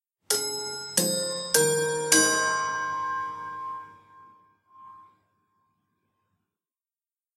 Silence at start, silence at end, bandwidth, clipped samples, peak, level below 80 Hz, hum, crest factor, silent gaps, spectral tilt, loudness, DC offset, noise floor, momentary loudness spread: 0.3 s; 2.35 s; 16 kHz; under 0.1%; -2 dBFS; -74 dBFS; none; 28 dB; none; -1.5 dB/octave; -25 LUFS; under 0.1%; under -90 dBFS; 16 LU